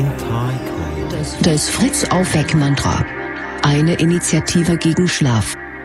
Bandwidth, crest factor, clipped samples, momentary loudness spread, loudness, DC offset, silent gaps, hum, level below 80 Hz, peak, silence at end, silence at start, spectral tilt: 14.5 kHz; 16 dB; under 0.1%; 8 LU; -17 LUFS; under 0.1%; none; none; -36 dBFS; -2 dBFS; 0 s; 0 s; -5 dB/octave